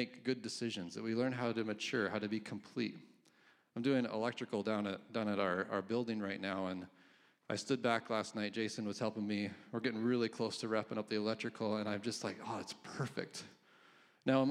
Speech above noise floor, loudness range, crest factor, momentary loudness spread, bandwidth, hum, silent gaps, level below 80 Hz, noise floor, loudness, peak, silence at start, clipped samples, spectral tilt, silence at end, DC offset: 31 dB; 2 LU; 20 dB; 8 LU; 12.5 kHz; none; none; -88 dBFS; -69 dBFS; -39 LUFS; -18 dBFS; 0 s; under 0.1%; -5 dB/octave; 0 s; under 0.1%